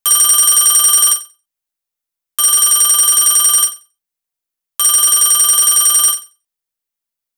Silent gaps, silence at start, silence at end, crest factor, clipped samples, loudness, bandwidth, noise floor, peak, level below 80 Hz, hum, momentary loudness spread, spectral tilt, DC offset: none; 0.05 s; 1.15 s; 14 dB; under 0.1%; -8 LUFS; over 20 kHz; -83 dBFS; 0 dBFS; -58 dBFS; none; 8 LU; 4.5 dB/octave; under 0.1%